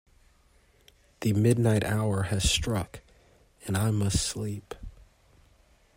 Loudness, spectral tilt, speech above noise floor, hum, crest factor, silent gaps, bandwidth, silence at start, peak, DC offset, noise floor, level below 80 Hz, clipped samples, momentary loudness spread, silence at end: -27 LUFS; -5 dB/octave; 36 dB; none; 20 dB; none; 16 kHz; 1.2 s; -10 dBFS; under 0.1%; -62 dBFS; -44 dBFS; under 0.1%; 19 LU; 1.05 s